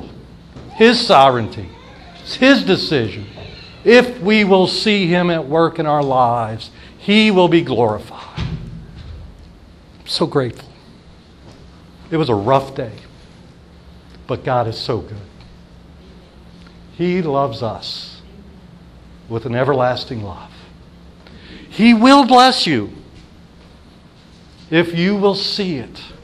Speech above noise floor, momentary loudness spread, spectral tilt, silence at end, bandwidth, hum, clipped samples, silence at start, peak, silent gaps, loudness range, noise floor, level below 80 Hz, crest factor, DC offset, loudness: 29 dB; 23 LU; -5.5 dB/octave; 0.1 s; 12.5 kHz; none; under 0.1%; 0 s; 0 dBFS; none; 11 LU; -44 dBFS; -44 dBFS; 18 dB; under 0.1%; -15 LUFS